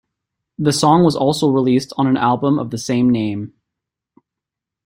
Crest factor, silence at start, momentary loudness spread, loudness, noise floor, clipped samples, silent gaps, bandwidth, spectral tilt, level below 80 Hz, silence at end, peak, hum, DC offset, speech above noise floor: 16 dB; 0.6 s; 8 LU; -16 LUFS; -84 dBFS; under 0.1%; none; 16 kHz; -6 dB/octave; -54 dBFS; 1.35 s; -2 dBFS; none; under 0.1%; 69 dB